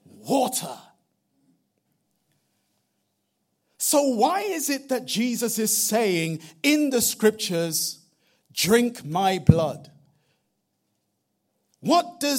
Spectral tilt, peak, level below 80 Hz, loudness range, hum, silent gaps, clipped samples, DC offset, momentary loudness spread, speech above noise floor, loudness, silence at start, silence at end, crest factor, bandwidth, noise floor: -4 dB/octave; 0 dBFS; -54 dBFS; 7 LU; none; none; under 0.1%; under 0.1%; 10 LU; 53 dB; -23 LUFS; 0.25 s; 0 s; 24 dB; 16.5 kHz; -75 dBFS